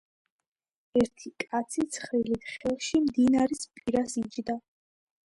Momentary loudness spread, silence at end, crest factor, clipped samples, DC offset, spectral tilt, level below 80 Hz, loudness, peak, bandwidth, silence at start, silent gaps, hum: 10 LU; 0.75 s; 16 dB; under 0.1%; under 0.1%; -4.5 dB/octave; -60 dBFS; -29 LUFS; -12 dBFS; 11.5 kHz; 0.95 s; none; none